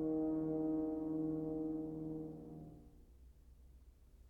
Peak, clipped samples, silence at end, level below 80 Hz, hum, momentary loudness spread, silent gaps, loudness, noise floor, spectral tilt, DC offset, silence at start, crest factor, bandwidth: -30 dBFS; under 0.1%; 0 s; -62 dBFS; none; 16 LU; none; -41 LUFS; -62 dBFS; -11 dB/octave; under 0.1%; 0 s; 12 dB; 1.8 kHz